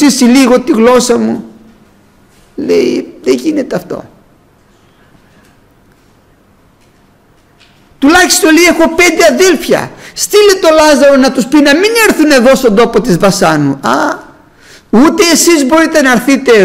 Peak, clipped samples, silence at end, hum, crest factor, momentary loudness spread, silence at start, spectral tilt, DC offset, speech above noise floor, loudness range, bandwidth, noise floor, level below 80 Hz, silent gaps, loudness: 0 dBFS; under 0.1%; 0 s; none; 8 dB; 10 LU; 0 s; -3.5 dB/octave; under 0.1%; 39 dB; 10 LU; 16.5 kHz; -46 dBFS; -40 dBFS; none; -7 LUFS